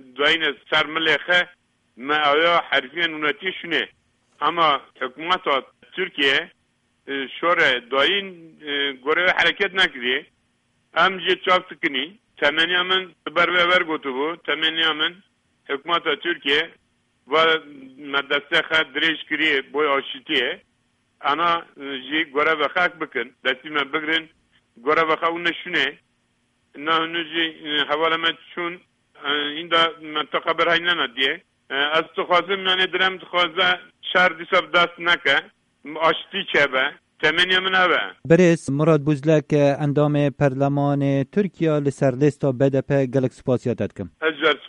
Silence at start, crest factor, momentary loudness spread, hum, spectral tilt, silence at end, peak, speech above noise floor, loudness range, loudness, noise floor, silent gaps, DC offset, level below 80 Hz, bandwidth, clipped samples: 0.15 s; 20 dB; 10 LU; none; -5 dB/octave; 0 s; -2 dBFS; 46 dB; 4 LU; -20 LUFS; -67 dBFS; none; under 0.1%; -60 dBFS; 10.5 kHz; under 0.1%